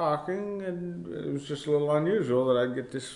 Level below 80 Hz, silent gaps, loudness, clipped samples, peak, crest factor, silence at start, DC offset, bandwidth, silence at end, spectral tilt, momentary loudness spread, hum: -66 dBFS; none; -29 LUFS; under 0.1%; -14 dBFS; 14 dB; 0 s; under 0.1%; 11 kHz; 0 s; -6.5 dB/octave; 10 LU; none